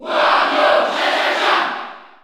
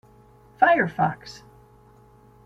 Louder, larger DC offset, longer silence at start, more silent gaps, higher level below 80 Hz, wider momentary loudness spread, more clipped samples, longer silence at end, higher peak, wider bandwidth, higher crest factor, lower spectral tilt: first, -15 LUFS vs -21 LUFS; neither; second, 0 s vs 0.6 s; neither; second, -66 dBFS vs -60 dBFS; second, 10 LU vs 21 LU; neither; second, 0.2 s vs 1.1 s; about the same, -2 dBFS vs -4 dBFS; first, 13.5 kHz vs 8 kHz; second, 16 dB vs 22 dB; second, -1.5 dB/octave vs -6.5 dB/octave